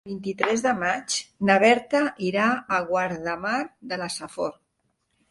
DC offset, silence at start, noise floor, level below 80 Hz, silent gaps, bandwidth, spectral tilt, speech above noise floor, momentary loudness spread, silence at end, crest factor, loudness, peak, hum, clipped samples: under 0.1%; 0.05 s; -73 dBFS; -64 dBFS; none; 11.5 kHz; -4 dB/octave; 49 dB; 13 LU; 0.8 s; 22 dB; -24 LUFS; -2 dBFS; none; under 0.1%